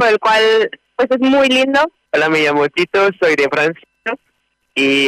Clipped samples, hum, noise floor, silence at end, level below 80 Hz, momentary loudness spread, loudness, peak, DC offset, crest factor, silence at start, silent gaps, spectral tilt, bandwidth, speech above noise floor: under 0.1%; none; -65 dBFS; 0 s; -56 dBFS; 12 LU; -14 LUFS; -6 dBFS; under 0.1%; 8 dB; 0 s; none; -4 dB/octave; 14.5 kHz; 52 dB